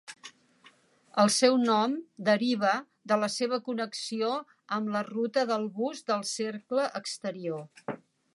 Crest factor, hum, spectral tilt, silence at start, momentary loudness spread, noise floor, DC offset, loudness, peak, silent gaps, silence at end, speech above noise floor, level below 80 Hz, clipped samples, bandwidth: 22 dB; none; -3.5 dB/octave; 0.1 s; 14 LU; -61 dBFS; under 0.1%; -29 LUFS; -8 dBFS; none; 0.4 s; 32 dB; -84 dBFS; under 0.1%; 11.5 kHz